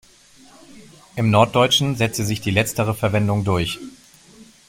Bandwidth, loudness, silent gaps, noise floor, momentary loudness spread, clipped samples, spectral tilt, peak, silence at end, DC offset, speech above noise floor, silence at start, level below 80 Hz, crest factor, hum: 16.5 kHz; -19 LUFS; none; -49 dBFS; 11 LU; under 0.1%; -5 dB/octave; -2 dBFS; 0.25 s; under 0.1%; 30 dB; 0.75 s; -48 dBFS; 20 dB; none